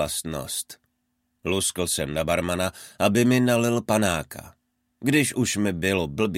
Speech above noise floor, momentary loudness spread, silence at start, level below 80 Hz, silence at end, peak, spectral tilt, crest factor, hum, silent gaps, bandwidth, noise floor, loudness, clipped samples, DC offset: 51 dB; 10 LU; 0 s; -50 dBFS; 0 s; -6 dBFS; -4.5 dB/octave; 18 dB; none; none; 16.5 kHz; -74 dBFS; -24 LUFS; under 0.1%; under 0.1%